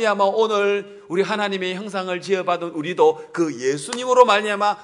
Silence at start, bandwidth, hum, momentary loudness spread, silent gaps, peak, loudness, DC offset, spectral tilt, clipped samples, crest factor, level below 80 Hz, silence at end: 0 s; 11 kHz; none; 10 LU; none; 0 dBFS; -20 LUFS; under 0.1%; -4 dB/octave; under 0.1%; 20 dB; -74 dBFS; 0 s